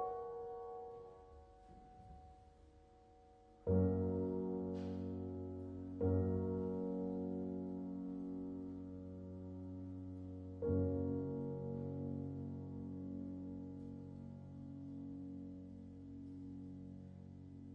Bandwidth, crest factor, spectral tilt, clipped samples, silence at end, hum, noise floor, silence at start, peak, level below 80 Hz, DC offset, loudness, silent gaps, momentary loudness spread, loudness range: 5 kHz; 20 dB; -11.5 dB/octave; under 0.1%; 0 s; none; -65 dBFS; 0 s; -24 dBFS; -64 dBFS; under 0.1%; -44 LUFS; none; 17 LU; 10 LU